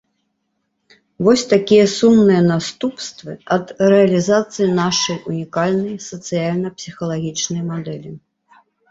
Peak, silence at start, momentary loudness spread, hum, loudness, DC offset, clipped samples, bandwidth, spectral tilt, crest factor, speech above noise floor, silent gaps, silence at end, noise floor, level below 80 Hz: -2 dBFS; 1.2 s; 15 LU; none; -17 LUFS; under 0.1%; under 0.1%; 8 kHz; -5 dB/octave; 16 dB; 54 dB; none; 0.75 s; -71 dBFS; -56 dBFS